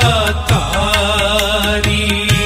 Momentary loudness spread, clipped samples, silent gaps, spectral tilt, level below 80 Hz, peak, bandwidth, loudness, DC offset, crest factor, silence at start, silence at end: 2 LU; under 0.1%; none; -4 dB/octave; -22 dBFS; 0 dBFS; 16 kHz; -14 LUFS; under 0.1%; 14 dB; 0 s; 0 s